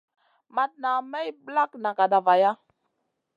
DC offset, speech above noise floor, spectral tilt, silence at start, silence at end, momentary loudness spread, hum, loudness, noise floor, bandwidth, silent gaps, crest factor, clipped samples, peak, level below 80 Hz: under 0.1%; 53 dB; -6 dB/octave; 0.55 s; 0.8 s; 13 LU; none; -25 LUFS; -77 dBFS; 7.2 kHz; none; 18 dB; under 0.1%; -8 dBFS; -88 dBFS